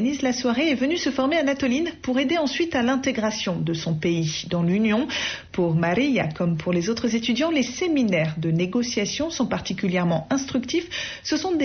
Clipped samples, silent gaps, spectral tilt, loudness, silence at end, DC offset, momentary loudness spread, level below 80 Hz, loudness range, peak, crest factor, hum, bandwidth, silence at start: under 0.1%; none; -4.5 dB/octave; -23 LUFS; 0 s; under 0.1%; 4 LU; -54 dBFS; 1 LU; -12 dBFS; 12 dB; none; 6.6 kHz; 0 s